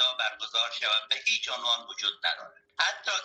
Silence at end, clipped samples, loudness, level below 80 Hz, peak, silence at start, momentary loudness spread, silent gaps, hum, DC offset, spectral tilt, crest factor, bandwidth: 0 s; under 0.1%; -27 LUFS; -80 dBFS; -10 dBFS; 0 s; 5 LU; none; none; under 0.1%; 3 dB/octave; 20 dB; 9.2 kHz